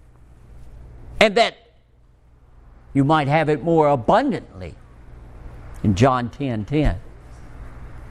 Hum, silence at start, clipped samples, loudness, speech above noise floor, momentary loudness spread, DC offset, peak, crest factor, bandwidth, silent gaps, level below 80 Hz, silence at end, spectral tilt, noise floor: none; 0.5 s; under 0.1%; -19 LUFS; 35 dB; 24 LU; under 0.1%; 0 dBFS; 22 dB; 12 kHz; none; -36 dBFS; 0 s; -6.5 dB/octave; -53 dBFS